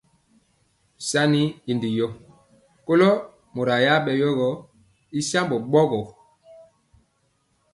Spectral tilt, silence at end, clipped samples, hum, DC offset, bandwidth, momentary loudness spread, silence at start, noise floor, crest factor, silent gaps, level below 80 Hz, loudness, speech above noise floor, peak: -5 dB/octave; 1.65 s; under 0.1%; none; under 0.1%; 11.5 kHz; 13 LU; 1 s; -68 dBFS; 20 dB; none; -62 dBFS; -22 LUFS; 47 dB; -4 dBFS